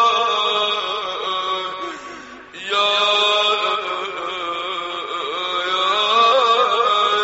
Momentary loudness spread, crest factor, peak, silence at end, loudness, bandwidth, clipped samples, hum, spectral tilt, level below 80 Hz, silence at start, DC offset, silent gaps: 13 LU; 16 dB; -4 dBFS; 0 s; -18 LUFS; 8 kHz; under 0.1%; none; 2.5 dB/octave; -62 dBFS; 0 s; under 0.1%; none